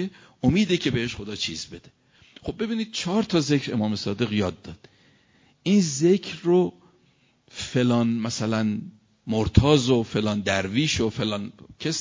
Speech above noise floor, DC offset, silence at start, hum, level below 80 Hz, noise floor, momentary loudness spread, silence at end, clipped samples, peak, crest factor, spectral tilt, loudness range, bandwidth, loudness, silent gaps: 39 dB; under 0.1%; 0 s; none; -42 dBFS; -63 dBFS; 14 LU; 0 s; under 0.1%; -2 dBFS; 22 dB; -5.5 dB/octave; 3 LU; 7.6 kHz; -24 LUFS; none